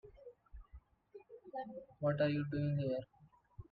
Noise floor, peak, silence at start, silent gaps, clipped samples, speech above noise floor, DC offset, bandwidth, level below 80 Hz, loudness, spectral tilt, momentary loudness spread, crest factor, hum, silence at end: -61 dBFS; -22 dBFS; 0.05 s; none; under 0.1%; 24 dB; under 0.1%; 4.9 kHz; -64 dBFS; -39 LUFS; -10.5 dB/octave; 24 LU; 18 dB; none; 0.1 s